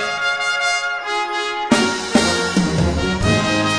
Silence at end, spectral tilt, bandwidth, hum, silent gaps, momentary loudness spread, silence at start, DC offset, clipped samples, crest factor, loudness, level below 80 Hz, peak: 0 s; -4 dB/octave; 10.5 kHz; none; none; 5 LU; 0 s; under 0.1%; under 0.1%; 16 dB; -18 LUFS; -34 dBFS; -2 dBFS